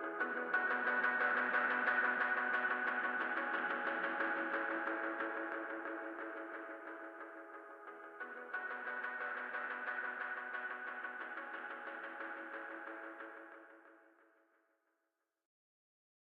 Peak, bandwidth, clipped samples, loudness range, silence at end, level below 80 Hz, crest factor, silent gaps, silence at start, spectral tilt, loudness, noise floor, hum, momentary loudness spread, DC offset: -22 dBFS; 5.6 kHz; under 0.1%; 15 LU; 2.25 s; under -90 dBFS; 18 dB; none; 0 s; -4.5 dB/octave; -39 LUFS; -87 dBFS; none; 16 LU; under 0.1%